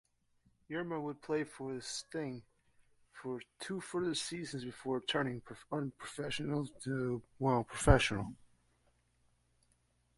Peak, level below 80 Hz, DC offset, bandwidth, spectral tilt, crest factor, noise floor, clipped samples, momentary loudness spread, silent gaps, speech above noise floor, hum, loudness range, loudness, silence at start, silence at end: -10 dBFS; -48 dBFS; under 0.1%; 11.5 kHz; -5 dB/octave; 28 dB; -75 dBFS; under 0.1%; 13 LU; none; 38 dB; 60 Hz at -70 dBFS; 7 LU; -37 LUFS; 0.7 s; 1.85 s